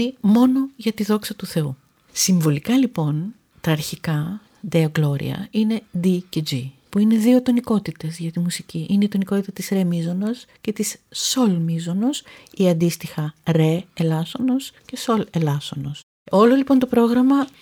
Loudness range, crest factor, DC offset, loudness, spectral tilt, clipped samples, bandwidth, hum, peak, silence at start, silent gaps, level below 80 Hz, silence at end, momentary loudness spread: 3 LU; 16 dB; under 0.1%; -21 LUFS; -6 dB/octave; under 0.1%; 19 kHz; none; -4 dBFS; 0 s; 16.03-16.26 s; -60 dBFS; 0.1 s; 12 LU